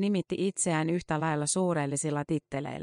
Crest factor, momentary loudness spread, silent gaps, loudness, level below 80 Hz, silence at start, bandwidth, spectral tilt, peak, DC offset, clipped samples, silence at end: 14 dB; 5 LU; none; -29 LUFS; -62 dBFS; 0 s; 10.5 kHz; -5 dB/octave; -16 dBFS; under 0.1%; under 0.1%; 0 s